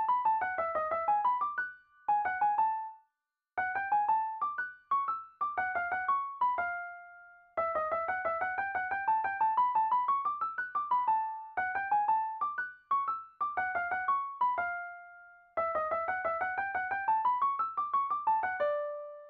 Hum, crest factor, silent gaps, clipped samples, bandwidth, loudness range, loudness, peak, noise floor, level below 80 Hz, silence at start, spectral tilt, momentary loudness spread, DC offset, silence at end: none; 14 dB; none; under 0.1%; 4.8 kHz; 3 LU; -32 LUFS; -20 dBFS; -87 dBFS; -72 dBFS; 0 s; -6 dB/octave; 7 LU; under 0.1%; 0 s